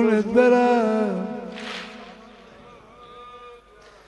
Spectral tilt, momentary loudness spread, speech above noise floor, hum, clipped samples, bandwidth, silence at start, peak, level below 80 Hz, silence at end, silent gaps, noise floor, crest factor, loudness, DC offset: -6.5 dB/octave; 26 LU; 31 dB; none; under 0.1%; 10.5 kHz; 0 s; -4 dBFS; -60 dBFS; 0.55 s; none; -50 dBFS; 18 dB; -21 LUFS; under 0.1%